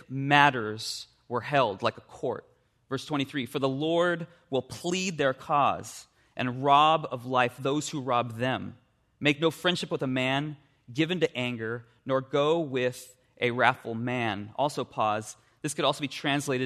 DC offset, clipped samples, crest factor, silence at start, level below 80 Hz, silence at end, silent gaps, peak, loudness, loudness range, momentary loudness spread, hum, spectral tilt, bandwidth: under 0.1%; under 0.1%; 24 dB; 0.1 s; -70 dBFS; 0 s; none; -4 dBFS; -28 LUFS; 3 LU; 12 LU; none; -4.5 dB/octave; 13.5 kHz